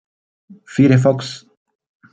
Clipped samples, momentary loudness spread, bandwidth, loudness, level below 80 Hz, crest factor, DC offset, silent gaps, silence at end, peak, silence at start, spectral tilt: under 0.1%; 18 LU; 8.8 kHz; -15 LUFS; -58 dBFS; 16 dB; under 0.1%; none; 0.75 s; -2 dBFS; 0.7 s; -7.5 dB/octave